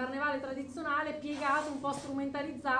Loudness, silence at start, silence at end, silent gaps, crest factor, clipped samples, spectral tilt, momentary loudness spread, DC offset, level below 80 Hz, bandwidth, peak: -35 LUFS; 0 s; 0 s; none; 16 dB; under 0.1%; -4.5 dB/octave; 6 LU; under 0.1%; -68 dBFS; 10 kHz; -18 dBFS